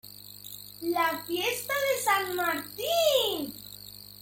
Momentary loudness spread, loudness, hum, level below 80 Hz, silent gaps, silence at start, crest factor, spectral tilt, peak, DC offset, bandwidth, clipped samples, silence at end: 18 LU; -28 LUFS; 50 Hz at -55 dBFS; -66 dBFS; none; 0.05 s; 18 dB; -2 dB/octave; -12 dBFS; under 0.1%; 17 kHz; under 0.1%; 0.05 s